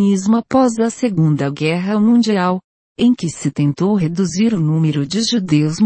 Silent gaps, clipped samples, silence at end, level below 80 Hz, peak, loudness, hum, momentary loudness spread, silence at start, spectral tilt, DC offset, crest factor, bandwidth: 2.64-2.95 s; under 0.1%; 0 s; -54 dBFS; -2 dBFS; -16 LUFS; none; 5 LU; 0 s; -6 dB/octave; under 0.1%; 12 dB; 8.8 kHz